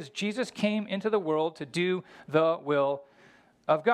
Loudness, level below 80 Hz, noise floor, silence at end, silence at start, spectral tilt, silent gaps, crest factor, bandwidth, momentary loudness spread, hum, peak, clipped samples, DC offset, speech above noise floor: -29 LUFS; -78 dBFS; -59 dBFS; 0 s; 0 s; -5.5 dB/octave; none; 18 dB; 12 kHz; 6 LU; none; -10 dBFS; under 0.1%; under 0.1%; 30 dB